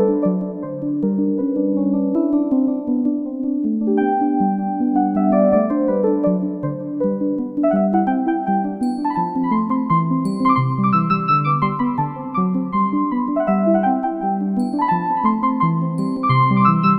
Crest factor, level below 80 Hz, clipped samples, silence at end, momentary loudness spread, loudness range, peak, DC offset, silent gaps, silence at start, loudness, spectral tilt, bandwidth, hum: 16 dB; -54 dBFS; under 0.1%; 0 s; 5 LU; 2 LU; -2 dBFS; under 0.1%; none; 0 s; -19 LUFS; -9.5 dB/octave; 10 kHz; none